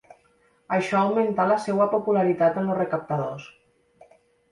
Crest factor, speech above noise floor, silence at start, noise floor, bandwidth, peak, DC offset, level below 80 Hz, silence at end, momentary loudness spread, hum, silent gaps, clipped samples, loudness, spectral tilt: 16 dB; 40 dB; 0.7 s; -63 dBFS; 11.5 kHz; -8 dBFS; under 0.1%; -66 dBFS; 1.05 s; 7 LU; none; none; under 0.1%; -23 LUFS; -7 dB/octave